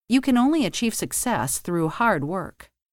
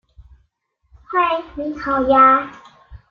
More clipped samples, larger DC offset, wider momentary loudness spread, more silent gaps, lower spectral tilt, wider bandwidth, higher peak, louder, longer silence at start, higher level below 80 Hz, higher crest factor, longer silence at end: neither; neither; second, 8 LU vs 15 LU; neither; second, -4 dB/octave vs -6.5 dB/octave; first, 17.5 kHz vs 6.8 kHz; second, -8 dBFS vs -2 dBFS; second, -23 LUFS vs -16 LUFS; about the same, 0.1 s vs 0.2 s; second, -52 dBFS vs -46 dBFS; about the same, 16 dB vs 16 dB; first, 0.3 s vs 0.15 s